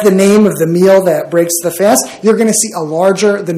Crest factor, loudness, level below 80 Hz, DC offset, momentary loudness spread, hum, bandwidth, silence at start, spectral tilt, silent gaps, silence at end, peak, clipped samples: 10 dB; -10 LUFS; -56 dBFS; under 0.1%; 5 LU; none; 16 kHz; 0 s; -4.5 dB/octave; none; 0 s; 0 dBFS; 0.8%